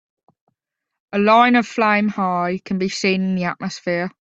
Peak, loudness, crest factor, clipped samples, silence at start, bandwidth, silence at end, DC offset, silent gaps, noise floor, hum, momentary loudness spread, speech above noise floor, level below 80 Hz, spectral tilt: -2 dBFS; -18 LUFS; 18 dB; under 0.1%; 1.15 s; 8 kHz; 0.15 s; under 0.1%; none; -79 dBFS; none; 10 LU; 61 dB; -62 dBFS; -5.5 dB/octave